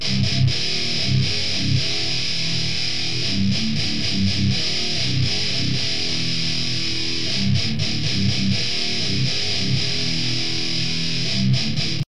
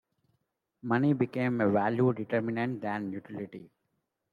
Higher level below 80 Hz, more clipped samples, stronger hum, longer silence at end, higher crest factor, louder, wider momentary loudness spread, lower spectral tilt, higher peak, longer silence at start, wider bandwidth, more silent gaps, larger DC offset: first, -44 dBFS vs -74 dBFS; neither; neither; second, 0 s vs 0.65 s; about the same, 14 dB vs 16 dB; first, -20 LUFS vs -30 LUFS; second, 2 LU vs 14 LU; second, -4 dB/octave vs -9.5 dB/octave; first, -6 dBFS vs -14 dBFS; second, 0 s vs 0.85 s; first, 11 kHz vs 4.9 kHz; neither; first, 6% vs under 0.1%